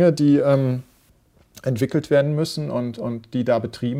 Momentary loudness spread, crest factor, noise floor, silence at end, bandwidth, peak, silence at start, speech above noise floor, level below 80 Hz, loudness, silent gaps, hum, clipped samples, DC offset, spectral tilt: 11 LU; 16 dB; -57 dBFS; 0 s; 15.5 kHz; -4 dBFS; 0 s; 37 dB; -58 dBFS; -21 LUFS; none; none; under 0.1%; under 0.1%; -7.5 dB/octave